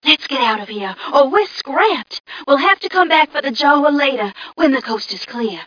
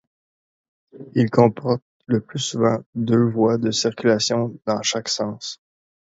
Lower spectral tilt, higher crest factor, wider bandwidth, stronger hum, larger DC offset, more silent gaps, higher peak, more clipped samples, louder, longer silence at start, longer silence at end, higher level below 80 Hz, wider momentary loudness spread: second, -3.5 dB/octave vs -5 dB/octave; about the same, 16 dB vs 20 dB; second, 5.4 kHz vs 8 kHz; neither; neither; second, 2.20-2.24 s vs 1.82-2.00 s, 2.86-2.93 s; about the same, 0 dBFS vs -2 dBFS; neither; first, -15 LUFS vs -21 LUFS; second, 0.05 s vs 0.95 s; second, 0 s vs 0.5 s; about the same, -62 dBFS vs -60 dBFS; about the same, 11 LU vs 9 LU